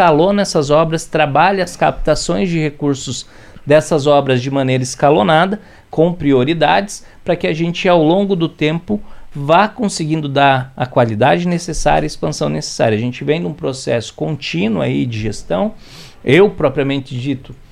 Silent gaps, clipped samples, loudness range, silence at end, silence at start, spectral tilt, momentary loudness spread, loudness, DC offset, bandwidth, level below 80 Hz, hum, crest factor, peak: none; under 0.1%; 4 LU; 0.15 s; 0 s; -5.5 dB/octave; 10 LU; -15 LUFS; under 0.1%; 13.5 kHz; -36 dBFS; none; 14 dB; 0 dBFS